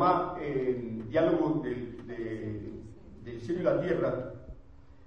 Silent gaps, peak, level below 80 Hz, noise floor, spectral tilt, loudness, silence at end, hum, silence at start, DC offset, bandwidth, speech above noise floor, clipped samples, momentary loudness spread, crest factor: none; -14 dBFS; -54 dBFS; -54 dBFS; -8.5 dB/octave; -31 LUFS; 0 s; none; 0 s; 0.2%; 7 kHz; 24 dB; under 0.1%; 19 LU; 18 dB